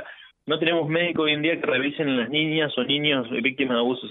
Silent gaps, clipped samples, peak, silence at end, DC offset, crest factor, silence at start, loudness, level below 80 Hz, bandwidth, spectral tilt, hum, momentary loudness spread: none; under 0.1%; -8 dBFS; 0 s; under 0.1%; 16 dB; 0 s; -23 LUFS; -68 dBFS; 4.1 kHz; -8.5 dB/octave; none; 3 LU